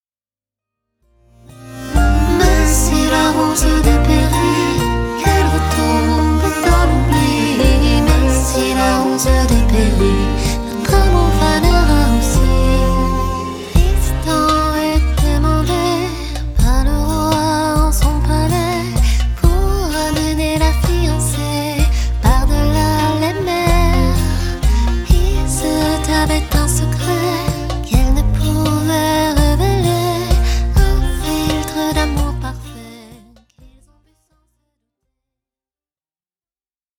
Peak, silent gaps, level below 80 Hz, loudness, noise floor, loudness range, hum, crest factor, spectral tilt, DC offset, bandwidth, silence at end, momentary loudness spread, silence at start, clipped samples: 0 dBFS; none; -16 dBFS; -15 LUFS; under -90 dBFS; 3 LU; none; 14 dB; -5.5 dB/octave; under 0.1%; 18.5 kHz; 3.85 s; 5 LU; 1.6 s; under 0.1%